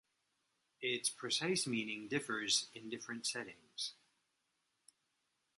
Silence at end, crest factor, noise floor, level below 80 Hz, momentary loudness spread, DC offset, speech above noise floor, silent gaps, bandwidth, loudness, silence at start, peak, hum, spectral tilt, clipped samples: 1.65 s; 22 dB; -84 dBFS; -86 dBFS; 11 LU; under 0.1%; 44 dB; none; 11.5 kHz; -38 LUFS; 0.8 s; -20 dBFS; none; -2 dB/octave; under 0.1%